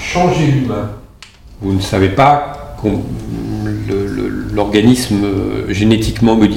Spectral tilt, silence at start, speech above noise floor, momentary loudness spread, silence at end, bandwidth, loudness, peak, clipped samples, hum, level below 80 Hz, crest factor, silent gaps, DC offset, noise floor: -6.5 dB/octave; 0 s; 25 dB; 12 LU; 0 s; 16.5 kHz; -14 LUFS; 0 dBFS; under 0.1%; none; -32 dBFS; 14 dB; none; under 0.1%; -38 dBFS